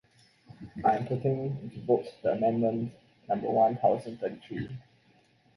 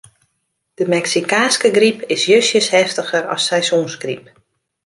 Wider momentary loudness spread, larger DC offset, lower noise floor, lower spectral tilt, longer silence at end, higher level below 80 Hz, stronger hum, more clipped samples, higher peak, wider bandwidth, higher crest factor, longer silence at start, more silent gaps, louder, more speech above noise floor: first, 14 LU vs 11 LU; neither; second, -64 dBFS vs -71 dBFS; first, -9 dB/octave vs -2.5 dB/octave; about the same, 0.75 s vs 0.65 s; about the same, -64 dBFS vs -66 dBFS; neither; neither; second, -12 dBFS vs -2 dBFS; about the same, 11.5 kHz vs 11.5 kHz; about the same, 18 dB vs 16 dB; second, 0.5 s vs 0.8 s; neither; second, -30 LUFS vs -15 LUFS; second, 35 dB vs 55 dB